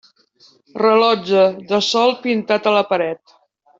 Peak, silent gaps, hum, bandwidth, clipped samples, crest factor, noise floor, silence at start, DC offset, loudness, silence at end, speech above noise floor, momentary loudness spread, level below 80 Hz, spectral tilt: -2 dBFS; none; none; 7.8 kHz; under 0.1%; 16 dB; -53 dBFS; 0.75 s; under 0.1%; -16 LUFS; 0.65 s; 37 dB; 8 LU; -66 dBFS; -4.5 dB/octave